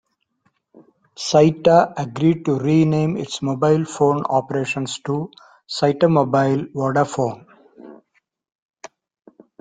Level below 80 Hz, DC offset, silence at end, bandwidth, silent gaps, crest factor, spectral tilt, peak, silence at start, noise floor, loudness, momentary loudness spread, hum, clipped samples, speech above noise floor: -58 dBFS; under 0.1%; 1.65 s; 9.4 kHz; none; 18 dB; -6.5 dB/octave; -2 dBFS; 1.2 s; -67 dBFS; -19 LUFS; 10 LU; none; under 0.1%; 49 dB